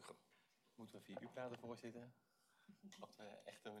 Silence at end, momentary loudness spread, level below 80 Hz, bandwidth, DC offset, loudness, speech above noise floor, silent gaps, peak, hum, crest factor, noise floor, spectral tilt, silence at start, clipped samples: 0 s; 12 LU; under -90 dBFS; 14.5 kHz; under 0.1%; -57 LUFS; 23 dB; none; -38 dBFS; none; 20 dB; -79 dBFS; -5 dB/octave; 0 s; under 0.1%